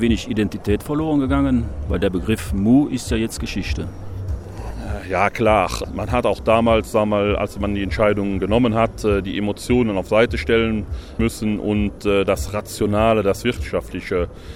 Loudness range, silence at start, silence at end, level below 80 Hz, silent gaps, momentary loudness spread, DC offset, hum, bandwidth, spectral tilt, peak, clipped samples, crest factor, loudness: 3 LU; 0 s; 0 s; -32 dBFS; none; 9 LU; under 0.1%; none; 16.5 kHz; -6 dB/octave; -2 dBFS; under 0.1%; 18 dB; -20 LUFS